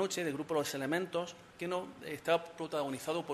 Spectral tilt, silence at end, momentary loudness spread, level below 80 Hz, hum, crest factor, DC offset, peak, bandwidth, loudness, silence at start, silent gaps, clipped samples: -4 dB/octave; 0 s; 7 LU; -76 dBFS; none; 20 dB; under 0.1%; -16 dBFS; 13.5 kHz; -37 LUFS; 0 s; none; under 0.1%